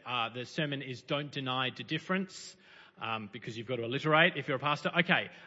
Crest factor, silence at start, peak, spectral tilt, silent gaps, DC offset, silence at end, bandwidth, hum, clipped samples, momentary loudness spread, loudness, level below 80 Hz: 24 dB; 0.05 s; -10 dBFS; -2.5 dB/octave; none; under 0.1%; 0 s; 7.6 kHz; none; under 0.1%; 15 LU; -32 LUFS; -78 dBFS